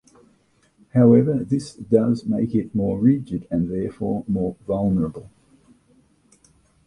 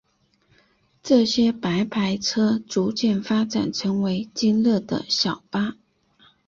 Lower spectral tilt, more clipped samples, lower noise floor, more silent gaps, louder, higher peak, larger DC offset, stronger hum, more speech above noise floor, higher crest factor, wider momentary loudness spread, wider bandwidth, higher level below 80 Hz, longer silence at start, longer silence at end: first, -9.5 dB/octave vs -5 dB/octave; neither; about the same, -61 dBFS vs -64 dBFS; neither; about the same, -21 LUFS vs -22 LUFS; first, -2 dBFS vs -6 dBFS; neither; neither; about the same, 41 dB vs 42 dB; about the same, 20 dB vs 18 dB; first, 11 LU vs 6 LU; first, 10.5 kHz vs 7.6 kHz; first, -48 dBFS vs -60 dBFS; about the same, 0.95 s vs 1.05 s; first, 1.6 s vs 0.75 s